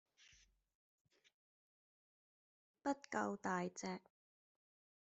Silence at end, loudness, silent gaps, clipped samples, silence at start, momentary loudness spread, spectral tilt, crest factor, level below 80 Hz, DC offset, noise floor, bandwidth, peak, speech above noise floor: 1.15 s; -44 LUFS; none; under 0.1%; 2.85 s; 7 LU; -5 dB/octave; 24 dB; -86 dBFS; under 0.1%; -72 dBFS; 8 kHz; -26 dBFS; 29 dB